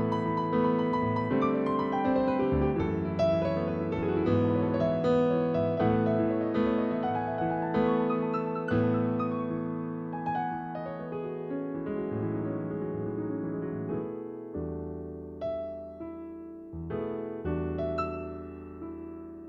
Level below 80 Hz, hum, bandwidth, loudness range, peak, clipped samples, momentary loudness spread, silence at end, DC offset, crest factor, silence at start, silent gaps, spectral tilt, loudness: -50 dBFS; none; 6.8 kHz; 9 LU; -14 dBFS; under 0.1%; 13 LU; 0 s; under 0.1%; 16 dB; 0 s; none; -9.5 dB/octave; -30 LUFS